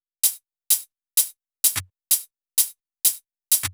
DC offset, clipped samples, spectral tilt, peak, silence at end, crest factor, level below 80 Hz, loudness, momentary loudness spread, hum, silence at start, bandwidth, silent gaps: under 0.1%; under 0.1%; 1.5 dB/octave; -4 dBFS; 0 s; 22 dB; -64 dBFS; -22 LUFS; 5 LU; none; 0.25 s; over 20 kHz; none